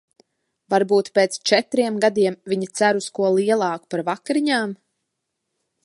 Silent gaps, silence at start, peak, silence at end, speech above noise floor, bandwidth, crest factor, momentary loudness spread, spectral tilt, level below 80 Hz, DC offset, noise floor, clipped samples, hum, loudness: none; 0.7 s; 0 dBFS; 1.1 s; 58 dB; 11.5 kHz; 20 dB; 7 LU; -4 dB/octave; -74 dBFS; under 0.1%; -78 dBFS; under 0.1%; none; -20 LUFS